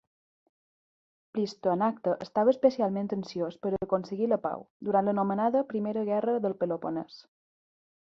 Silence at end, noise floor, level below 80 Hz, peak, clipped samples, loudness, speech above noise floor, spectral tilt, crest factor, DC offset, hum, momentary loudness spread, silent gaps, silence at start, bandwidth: 0.85 s; under -90 dBFS; -70 dBFS; -10 dBFS; under 0.1%; -29 LUFS; over 62 dB; -8 dB/octave; 20 dB; under 0.1%; none; 9 LU; 4.70-4.80 s; 1.35 s; 7.4 kHz